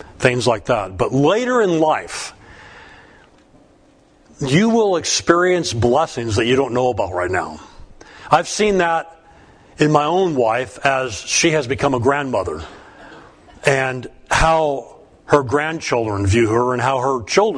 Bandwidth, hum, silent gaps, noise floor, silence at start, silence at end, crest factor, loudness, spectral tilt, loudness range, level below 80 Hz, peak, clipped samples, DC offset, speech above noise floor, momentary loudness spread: 10.5 kHz; none; none; -52 dBFS; 0.1 s; 0 s; 18 dB; -17 LUFS; -4.5 dB/octave; 3 LU; -40 dBFS; 0 dBFS; under 0.1%; under 0.1%; 35 dB; 8 LU